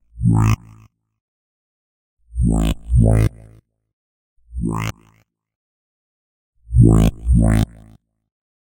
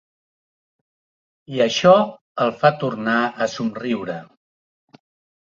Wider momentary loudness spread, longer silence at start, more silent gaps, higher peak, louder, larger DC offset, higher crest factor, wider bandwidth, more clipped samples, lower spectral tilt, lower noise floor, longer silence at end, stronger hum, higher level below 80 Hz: about the same, 13 LU vs 12 LU; second, 0.15 s vs 1.5 s; first, 1.21-2.17 s, 3.93-4.36 s, 5.55-6.53 s vs 2.21-2.35 s; about the same, 0 dBFS vs -2 dBFS; about the same, -18 LUFS vs -19 LUFS; neither; about the same, 20 dB vs 20 dB; first, 17 kHz vs 7.6 kHz; neither; first, -7.5 dB/octave vs -5 dB/octave; second, -58 dBFS vs under -90 dBFS; about the same, 1.1 s vs 1.15 s; neither; first, -24 dBFS vs -64 dBFS